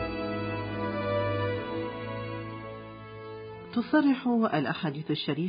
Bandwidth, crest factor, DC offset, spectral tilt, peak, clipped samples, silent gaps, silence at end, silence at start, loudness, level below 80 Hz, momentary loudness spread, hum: 5.2 kHz; 16 dB; under 0.1%; -10.5 dB/octave; -14 dBFS; under 0.1%; none; 0 s; 0 s; -30 LUFS; -54 dBFS; 17 LU; none